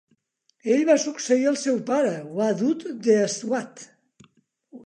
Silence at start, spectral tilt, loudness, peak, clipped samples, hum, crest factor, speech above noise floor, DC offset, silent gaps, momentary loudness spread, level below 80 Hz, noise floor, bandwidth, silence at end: 0.65 s; -4.5 dB/octave; -23 LUFS; -6 dBFS; under 0.1%; none; 18 dB; 46 dB; under 0.1%; none; 8 LU; -78 dBFS; -68 dBFS; 10.5 kHz; 0.05 s